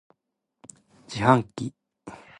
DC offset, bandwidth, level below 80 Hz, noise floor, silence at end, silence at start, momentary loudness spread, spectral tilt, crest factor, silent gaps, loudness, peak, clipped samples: under 0.1%; 11 kHz; -58 dBFS; -81 dBFS; 0.25 s; 1.1 s; 24 LU; -6.5 dB/octave; 26 dB; none; -24 LUFS; -2 dBFS; under 0.1%